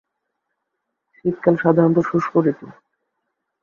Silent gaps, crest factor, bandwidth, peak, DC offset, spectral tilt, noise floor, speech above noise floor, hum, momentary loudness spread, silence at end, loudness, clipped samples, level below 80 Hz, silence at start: none; 20 dB; 7 kHz; -2 dBFS; under 0.1%; -10 dB/octave; -78 dBFS; 60 dB; none; 10 LU; 0.9 s; -18 LUFS; under 0.1%; -62 dBFS; 1.25 s